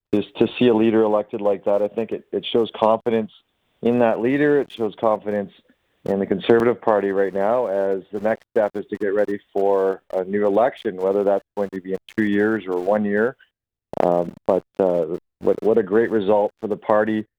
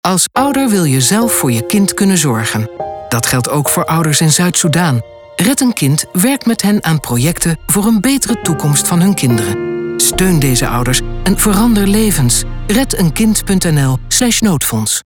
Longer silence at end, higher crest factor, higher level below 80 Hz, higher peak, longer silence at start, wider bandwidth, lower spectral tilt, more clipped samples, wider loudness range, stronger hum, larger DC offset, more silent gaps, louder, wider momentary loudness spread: about the same, 0.15 s vs 0.05 s; first, 18 dB vs 12 dB; second, -60 dBFS vs -28 dBFS; about the same, -2 dBFS vs 0 dBFS; about the same, 0.1 s vs 0.05 s; second, 9 kHz vs 19.5 kHz; first, -8 dB/octave vs -4 dB/octave; neither; about the same, 2 LU vs 1 LU; neither; neither; neither; second, -21 LUFS vs -12 LUFS; first, 9 LU vs 5 LU